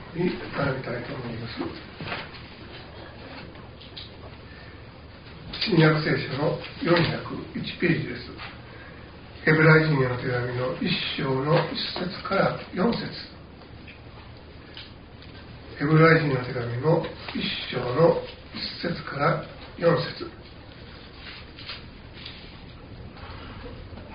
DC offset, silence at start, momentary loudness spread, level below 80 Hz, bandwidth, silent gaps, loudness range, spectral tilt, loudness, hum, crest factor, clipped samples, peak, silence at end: under 0.1%; 0 s; 23 LU; -50 dBFS; 5.2 kHz; none; 15 LU; -4.5 dB/octave; -25 LUFS; none; 22 dB; under 0.1%; -6 dBFS; 0 s